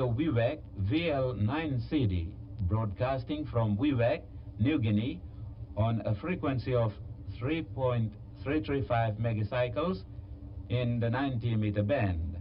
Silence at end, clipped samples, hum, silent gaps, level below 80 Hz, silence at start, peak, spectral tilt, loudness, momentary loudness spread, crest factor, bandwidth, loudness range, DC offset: 0 s; under 0.1%; none; none; -48 dBFS; 0 s; -16 dBFS; -11 dB/octave; -32 LUFS; 11 LU; 14 dB; 5.4 kHz; 2 LU; under 0.1%